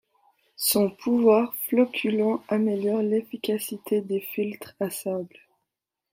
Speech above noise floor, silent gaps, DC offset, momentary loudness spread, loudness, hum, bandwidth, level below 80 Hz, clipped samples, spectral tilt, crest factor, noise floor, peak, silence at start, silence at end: 60 dB; none; under 0.1%; 10 LU; -25 LUFS; none; 16.5 kHz; -74 dBFS; under 0.1%; -4.5 dB/octave; 18 dB; -84 dBFS; -8 dBFS; 0.6 s; 0.85 s